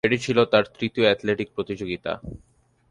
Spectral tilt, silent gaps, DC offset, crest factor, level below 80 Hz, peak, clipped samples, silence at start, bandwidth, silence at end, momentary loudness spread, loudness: -5.5 dB/octave; none; under 0.1%; 20 dB; -52 dBFS; -4 dBFS; under 0.1%; 0.05 s; 11 kHz; 0.55 s; 12 LU; -23 LUFS